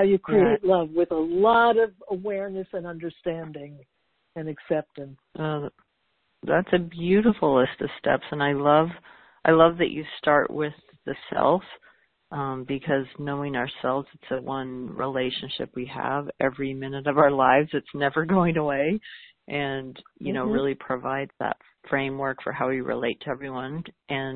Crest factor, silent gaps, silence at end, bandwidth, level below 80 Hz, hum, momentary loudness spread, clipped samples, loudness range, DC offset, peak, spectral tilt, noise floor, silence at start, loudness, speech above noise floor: 22 dB; none; 0 s; 4.6 kHz; -56 dBFS; none; 15 LU; under 0.1%; 7 LU; under 0.1%; -4 dBFS; -10.5 dB/octave; -73 dBFS; 0 s; -25 LUFS; 48 dB